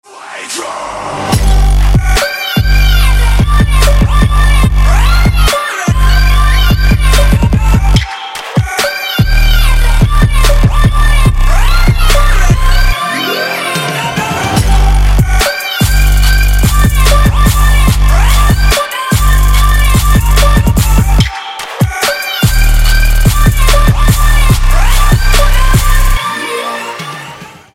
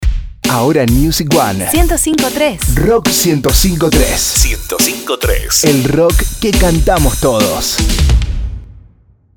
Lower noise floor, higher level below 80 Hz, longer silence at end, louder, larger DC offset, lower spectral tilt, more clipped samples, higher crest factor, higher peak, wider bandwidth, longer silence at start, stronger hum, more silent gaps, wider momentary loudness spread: second, -30 dBFS vs -46 dBFS; first, -8 dBFS vs -16 dBFS; second, 0.25 s vs 0.6 s; about the same, -10 LUFS vs -12 LUFS; first, 0.9% vs under 0.1%; about the same, -4.5 dB/octave vs -4 dB/octave; neither; about the same, 8 dB vs 12 dB; about the same, 0 dBFS vs 0 dBFS; second, 16.5 kHz vs over 20 kHz; about the same, 0.1 s vs 0 s; neither; neither; about the same, 6 LU vs 5 LU